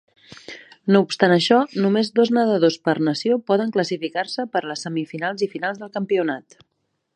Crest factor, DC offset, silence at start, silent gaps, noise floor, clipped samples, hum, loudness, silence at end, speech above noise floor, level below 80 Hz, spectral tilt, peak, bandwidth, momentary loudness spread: 20 dB; under 0.1%; 0.5 s; none; -41 dBFS; under 0.1%; none; -21 LUFS; 0.75 s; 21 dB; -70 dBFS; -5.5 dB/octave; -2 dBFS; 10.5 kHz; 10 LU